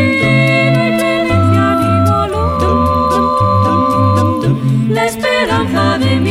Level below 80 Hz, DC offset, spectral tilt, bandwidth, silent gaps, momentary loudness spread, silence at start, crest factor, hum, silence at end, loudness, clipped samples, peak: -32 dBFS; under 0.1%; -6.5 dB/octave; 16 kHz; none; 3 LU; 0 s; 10 dB; none; 0 s; -12 LUFS; under 0.1%; 0 dBFS